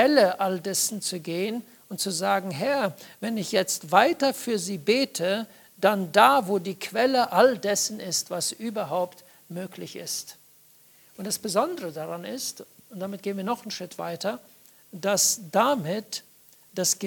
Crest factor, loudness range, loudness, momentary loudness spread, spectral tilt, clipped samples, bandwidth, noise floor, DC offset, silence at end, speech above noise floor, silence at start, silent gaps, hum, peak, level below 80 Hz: 24 dB; 9 LU; -25 LUFS; 16 LU; -3 dB/octave; under 0.1%; 19 kHz; -56 dBFS; under 0.1%; 0 s; 31 dB; 0 s; none; none; -2 dBFS; -76 dBFS